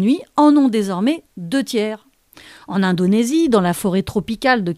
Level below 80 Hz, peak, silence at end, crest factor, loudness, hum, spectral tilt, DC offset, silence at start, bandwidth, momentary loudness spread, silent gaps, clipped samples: -50 dBFS; -2 dBFS; 0 s; 16 dB; -17 LUFS; none; -6 dB/octave; under 0.1%; 0 s; 15 kHz; 10 LU; none; under 0.1%